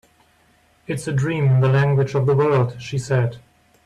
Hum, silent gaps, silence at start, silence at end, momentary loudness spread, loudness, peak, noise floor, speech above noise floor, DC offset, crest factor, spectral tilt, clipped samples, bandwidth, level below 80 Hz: none; none; 0.9 s; 0.45 s; 10 LU; -19 LUFS; -6 dBFS; -58 dBFS; 39 dB; under 0.1%; 14 dB; -7.5 dB/octave; under 0.1%; 11 kHz; -54 dBFS